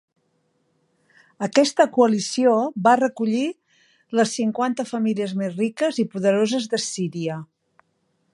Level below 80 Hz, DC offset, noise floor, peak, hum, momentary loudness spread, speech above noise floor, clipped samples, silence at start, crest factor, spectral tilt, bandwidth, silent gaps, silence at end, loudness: -74 dBFS; under 0.1%; -69 dBFS; -2 dBFS; none; 9 LU; 48 dB; under 0.1%; 1.4 s; 20 dB; -4.5 dB/octave; 11.5 kHz; none; 0.9 s; -21 LUFS